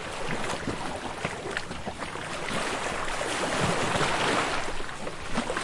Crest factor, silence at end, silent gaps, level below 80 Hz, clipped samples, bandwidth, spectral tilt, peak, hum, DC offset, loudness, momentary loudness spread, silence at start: 18 dB; 0 s; none; -44 dBFS; under 0.1%; 11.5 kHz; -3.5 dB/octave; -12 dBFS; none; under 0.1%; -30 LUFS; 10 LU; 0 s